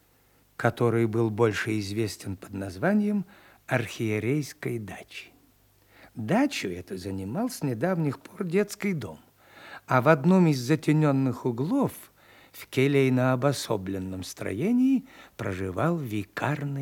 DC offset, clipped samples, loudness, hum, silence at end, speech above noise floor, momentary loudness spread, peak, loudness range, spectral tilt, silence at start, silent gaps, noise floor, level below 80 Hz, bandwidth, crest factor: under 0.1%; under 0.1%; -27 LUFS; none; 0 s; 36 dB; 14 LU; -6 dBFS; 6 LU; -6.5 dB/octave; 0.6 s; none; -63 dBFS; -68 dBFS; 18.5 kHz; 22 dB